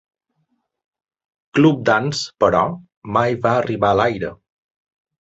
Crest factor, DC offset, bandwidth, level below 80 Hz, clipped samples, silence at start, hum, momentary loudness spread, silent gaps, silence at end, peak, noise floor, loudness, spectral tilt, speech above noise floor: 18 dB; under 0.1%; 8.2 kHz; -50 dBFS; under 0.1%; 1.55 s; none; 9 LU; 2.97-3.02 s; 0.9 s; -2 dBFS; -70 dBFS; -18 LUFS; -6 dB/octave; 52 dB